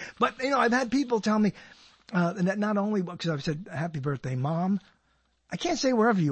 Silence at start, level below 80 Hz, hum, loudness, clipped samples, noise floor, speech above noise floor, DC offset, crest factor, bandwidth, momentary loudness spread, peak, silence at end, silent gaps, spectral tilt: 0 s; -62 dBFS; none; -27 LUFS; under 0.1%; -70 dBFS; 43 dB; under 0.1%; 16 dB; 8.6 kHz; 9 LU; -10 dBFS; 0 s; none; -6 dB/octave